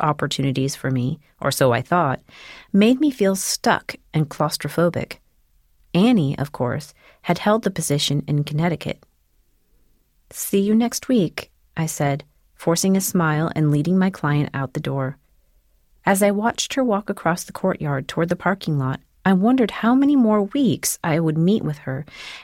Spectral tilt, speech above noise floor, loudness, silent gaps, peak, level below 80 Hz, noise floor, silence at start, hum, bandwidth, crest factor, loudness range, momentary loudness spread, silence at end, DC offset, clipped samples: -5.5 dB/octave; 41 dB; -21 LUFS; none; -4 dBFS; -54 dBFS; -61 dBFS; 0 s; none; 17 kHz; 16 dB; 4 LU; 11 LU; 0 s; under 0.1%; under 0.1%